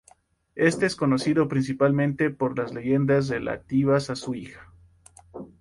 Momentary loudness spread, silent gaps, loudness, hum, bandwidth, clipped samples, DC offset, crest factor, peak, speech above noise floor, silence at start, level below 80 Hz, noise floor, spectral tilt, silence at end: 16 LU; none; -24 LUFS; none; 11.5 kHz; under 0.1%; under 0.1%; 18 dB; -8 dBFS; 36 dB; 0.55 s; -56 dBFS; -59 dBFS; -6.5 dB/octave; 0.15 s